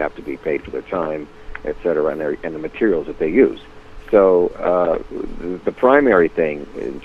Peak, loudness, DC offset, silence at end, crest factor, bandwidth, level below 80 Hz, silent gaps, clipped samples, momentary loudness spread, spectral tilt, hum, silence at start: 0 dBFS; -18 LUFS; under 0.1%; 0 s; 18 dB; 6.6 kHz; -40 dBFS; none; under 0.1%; 15 LU; -8 dB/octave; none; 0 s